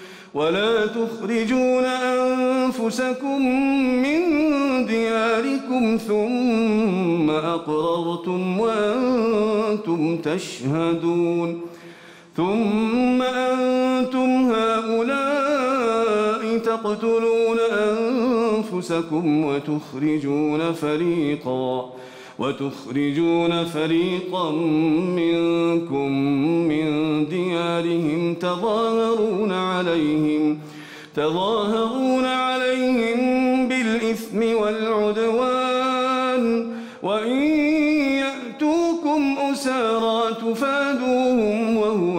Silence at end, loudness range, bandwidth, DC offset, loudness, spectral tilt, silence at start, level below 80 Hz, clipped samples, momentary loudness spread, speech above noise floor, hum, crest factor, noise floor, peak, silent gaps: 0 s; 2 LU; 15.5 kHz; under 0.1%; -21 LUFS; -6 dB/octave; 0 s; -58 dBFS; under 0.1%; 5 LU; 24 dB; none; 8 dB; -44 dBFS; -12 dBFS; none